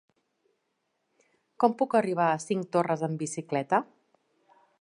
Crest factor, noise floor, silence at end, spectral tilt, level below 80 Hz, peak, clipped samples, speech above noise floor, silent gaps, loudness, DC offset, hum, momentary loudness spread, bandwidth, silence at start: 22 dB; -78 dBFS; 0.95 s; -6 dB/octave; -82 dBFS; -8 dBFS; under 0.1%; 51 dB; none; -28 LUFS; under 0.1%; none; 7 LU; 11.5 kHz; 1.6 s